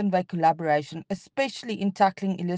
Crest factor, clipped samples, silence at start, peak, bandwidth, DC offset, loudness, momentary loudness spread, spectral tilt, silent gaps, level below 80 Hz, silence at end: 18 dB; under 0.1%; 0 s; -8 dBFS; 9.2 kHz; under 0.1%; -26 LUFS; 9 LU; -6.5 dB/octave; none; -70 dBFS; 0 s